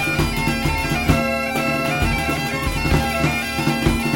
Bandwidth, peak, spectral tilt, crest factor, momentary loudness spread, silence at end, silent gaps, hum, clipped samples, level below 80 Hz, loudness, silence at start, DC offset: 16.5 kHz; -2 dBFS; -5 dB/octave; 18 dB; 2 LU; 0 s; none; none; under 0.1%; -30 dBFS; -20 LUFS; 0 s; 0.3%